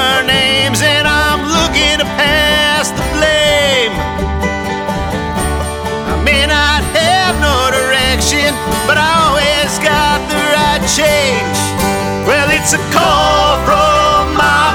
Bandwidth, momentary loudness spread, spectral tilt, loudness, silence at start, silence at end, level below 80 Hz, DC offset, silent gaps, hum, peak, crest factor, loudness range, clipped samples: over 20 kHz; 7 LU; -3 dB/octave; -11 LUFS; 0 s; 0 s; -24 dBFS; under 0.1%; none; none; 0 dBFS; 12 dB; 3 LU; under 0.1%